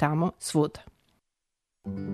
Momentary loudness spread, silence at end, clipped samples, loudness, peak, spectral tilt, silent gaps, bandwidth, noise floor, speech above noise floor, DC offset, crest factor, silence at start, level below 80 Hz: 17 LU; 0 s; under 0.1%; -29 LUFS; -10 dBFS; -6 dB/octave; none; 13.5 kHz; -84 dBFS; 56 dB; under 0.1%; 20 dB; 0 s; -60 dBFS